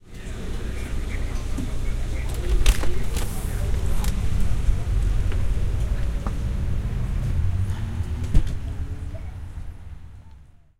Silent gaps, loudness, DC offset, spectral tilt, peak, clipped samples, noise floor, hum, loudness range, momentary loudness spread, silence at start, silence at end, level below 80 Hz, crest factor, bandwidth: none; -28 LUFS; under 0.1%; -5.5 dB/octave; -2 dBFS; under 0.1%; -47 dBFS; none; 2 LU; 11 LU; 0.05 s; 0.35 s; -24 dBFS; 20 dB; 16 kHz